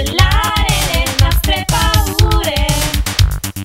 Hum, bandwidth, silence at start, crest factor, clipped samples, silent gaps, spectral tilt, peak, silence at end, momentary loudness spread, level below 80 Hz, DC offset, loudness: none; 16.5 kHz; 0 s; 14 dB; under 0.1%; none; -3.5 dB/octave; 0 dBFS; 0 s; 3 LU; -18 dBFS; under 0.1%; -14 LUFS